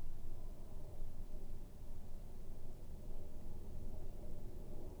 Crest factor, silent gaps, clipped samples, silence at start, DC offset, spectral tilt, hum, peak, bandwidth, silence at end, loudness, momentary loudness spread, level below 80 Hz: 10 dB; none; under 0.1%; 0 s; under 0.1%; -7 dB/octave; none; -32 dBFS; 1.5 kHz; 0 s; -55 LUFS; 3 LU; -44 dBFS